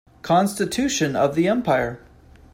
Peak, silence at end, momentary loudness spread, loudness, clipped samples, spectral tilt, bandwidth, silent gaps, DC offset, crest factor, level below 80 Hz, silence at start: -6 dBFS; 0.55 s; 4 LU; -21 LUFS; under 0.1%; -5 dB/octave; 16 kHz; none; under 0.1%; 16 dB; -50 dBFS; 0.25 s